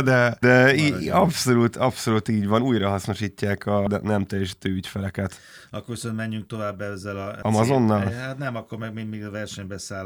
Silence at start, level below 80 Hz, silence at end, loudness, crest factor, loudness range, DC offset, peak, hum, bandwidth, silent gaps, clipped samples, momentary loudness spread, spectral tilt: 0 s; -58 dBFS; 0 s; -23 LUFS; 18 dB; 8 LU; under 0.1%; -4 dBFS; none; 19 kHz; none; under 0.1%; 14 LU; -6 dB/octave